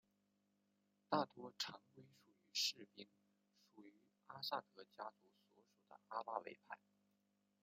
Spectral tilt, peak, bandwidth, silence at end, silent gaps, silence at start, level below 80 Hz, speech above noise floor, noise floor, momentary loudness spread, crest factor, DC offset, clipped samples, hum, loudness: -2.5 dB/octave; -24 dBFS; 15.5 kHz; 0.85 s; none; 1.1 s; under -90 dBFS; 35 dB; -84 dBFS; 24 LU; 28 dB; under 0.1%; under 0.1%; 50 Hz at -75 dBFS; -47 LUFS